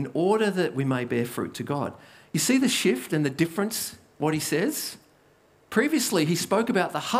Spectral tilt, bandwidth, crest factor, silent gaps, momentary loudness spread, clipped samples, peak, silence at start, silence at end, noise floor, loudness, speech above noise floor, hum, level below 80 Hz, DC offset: -4.5 dB/octave; 16 kHz; 18 dB; none; 8 LU; under 0.1%; -8 dBFS; 0 s; 0 s; -60 dBFS; -25 LUFS; 34 dB; none; -70 dBFS; under 0.1%